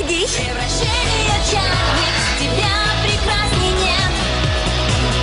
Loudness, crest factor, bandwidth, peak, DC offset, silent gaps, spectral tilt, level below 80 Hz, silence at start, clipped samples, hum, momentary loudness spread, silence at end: -16 LUFS; 14 dB; 11 kHz; -4 dBFS; under 0.1%; none; -3.5 dB/octave; -24 dBFS; 0 s; under 0.1%; none; 2 LU; 0 s